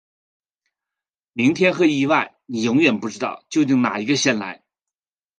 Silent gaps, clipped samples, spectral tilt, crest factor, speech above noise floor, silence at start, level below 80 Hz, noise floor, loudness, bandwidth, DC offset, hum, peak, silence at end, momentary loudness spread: none; under 0.1%; -4.5 dB/octave; 18 dB; over 71 dB; 1.35 s; -66 dBFS; under -90 dBFS; -19 LUFS; 9.4 kHz; under 0.1%; none; -2 dBFS; 0.85 s; 11 LU